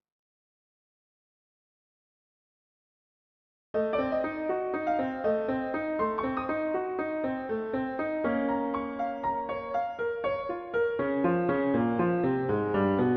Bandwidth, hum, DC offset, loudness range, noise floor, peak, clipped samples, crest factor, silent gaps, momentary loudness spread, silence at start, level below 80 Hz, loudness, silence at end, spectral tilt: 5.6 kHz; none; under 0.1%; 6 LU; under -90 dBFS; -14 dBFS; under 0.1%; 16 dB; none; 5 LU; 3.75 s; -60 dBFS; -30 LUFS; 0 s; -6.5 dB/octave